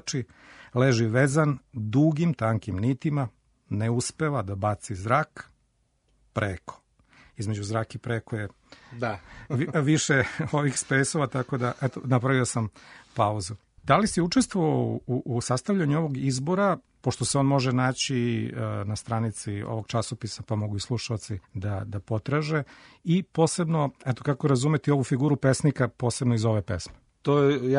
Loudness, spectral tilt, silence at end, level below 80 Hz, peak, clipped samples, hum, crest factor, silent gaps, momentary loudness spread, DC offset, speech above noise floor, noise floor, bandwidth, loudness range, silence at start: -26 LUFS; -5.5 dB/octave; 0 s; -56 dBFS; -4 dBFS; under 0.1%; none; 22 dB; none; 11 LU; under 0.1%; 44 dB; -70 dBFS; 11 kHz; 6 LU; 0.05 s